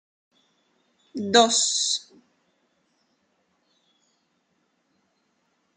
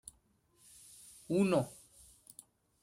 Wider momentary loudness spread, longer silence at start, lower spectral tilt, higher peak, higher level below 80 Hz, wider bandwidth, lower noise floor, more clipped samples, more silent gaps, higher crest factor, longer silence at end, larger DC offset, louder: second, 16 LU vs 26 LU; second, 1.15 s vs 1.3 s; second, -1 dB/octave vs -6.5 dB/octave; first, -4 dBFS vs -18 dBFS; second, -82 dBFS vs -72 dBFS; second, 10 kHz vs 16 kHz; about the same, -71 dBFS vs -72 dBFS; neither; neither; first, 26 dB vs 20 dB; first, 3.75 s vs 1.1 s; neither; first, -21 LUFS vs -33 LUFS